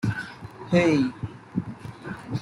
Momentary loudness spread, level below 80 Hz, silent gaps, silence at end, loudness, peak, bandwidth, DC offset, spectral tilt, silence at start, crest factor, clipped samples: 18 LU; -54 dBFS; none; 0 s; -25 LUFS; -8 dBFS; 11.5 kHz; under 0.1%; -7 dB/octave; 0 s; 18 dB; under 0.1%